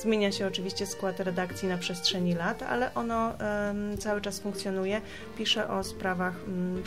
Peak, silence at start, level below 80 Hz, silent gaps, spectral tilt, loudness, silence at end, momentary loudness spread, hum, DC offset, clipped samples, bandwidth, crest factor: -14 dBFS; 0 s; -54 dBFS; none; -4.5 dB/octave; -31 LUFS; 0 s; 6 LU; none; 0.3%; under 0.1%; 16 kHz; 18 dB